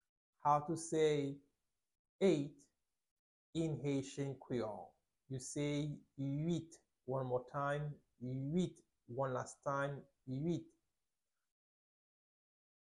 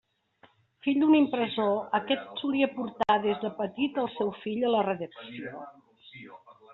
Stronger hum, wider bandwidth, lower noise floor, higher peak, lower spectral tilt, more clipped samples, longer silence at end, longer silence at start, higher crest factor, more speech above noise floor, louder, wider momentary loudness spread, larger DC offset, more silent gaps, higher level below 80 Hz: neither; first, 11.5 kHz vs 4.2 kHz; first, under -90 dBFS vs -62 dBFS; second, -20 dBFS vs -12 dBFS; first, -6.5 dB/octave vs -3.5 dB/octave; neither; first, 2.3 s vs 0 s; second, 0.45 s vs 0.85 s; about the same, 22 dB vs 18 dB; first, over 51 dB vs 35 dB; second, -41 LUFS vs -28 LUFS; second, 13 LU vs 20 LU; neither; first, 1.99-2.19 s, 3.11-3.53 s vs none; about the same, -74 dBFS vs -72 dBFS